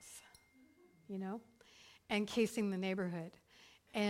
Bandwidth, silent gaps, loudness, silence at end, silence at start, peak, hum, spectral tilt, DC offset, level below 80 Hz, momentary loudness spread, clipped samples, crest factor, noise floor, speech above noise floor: 16 kHz; none; -40 LUFS; 0 s; 0 s; -22 dBFS; none; -5 dB/octave; under 0.1%; -76 dBFS; 25 LU; under 0.1%; 20 dB; -67 dBFS; 28 dB